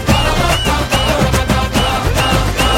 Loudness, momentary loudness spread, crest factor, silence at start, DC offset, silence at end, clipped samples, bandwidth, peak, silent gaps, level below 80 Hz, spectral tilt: -14 LUFS; 1 LU; 14 dB; 0 s; under 0.1%; 0 s; under 0.1%; 16.5 kHz; 0 dBFS; none; -20 dBFS; -4.5 dB/octave